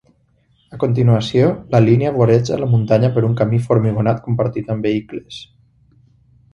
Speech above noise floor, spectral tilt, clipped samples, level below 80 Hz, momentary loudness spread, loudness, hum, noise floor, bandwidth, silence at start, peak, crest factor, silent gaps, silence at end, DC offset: 43 dB; -8.5 dB/octave; under 0.1%; -48 dBFS; 9 LU; -16 LUFS; none; -58 dBFS; 7.2 kHz; 0.7 s; 0 dBFS; 16 dB; none; 1.1 s; under 0.1%